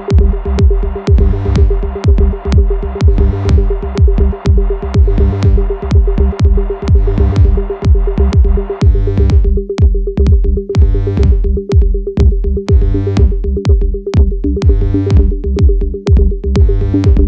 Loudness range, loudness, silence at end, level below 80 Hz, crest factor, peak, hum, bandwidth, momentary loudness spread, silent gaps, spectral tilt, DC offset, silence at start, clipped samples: 1 LU; -12 LUFS; 0 s; -10 dBFS; 8 dB; 0 dBFS; none; 7 kHz; 3 LU; none; -9 dB/octave; under 0.1%; 0 s; under 0.1%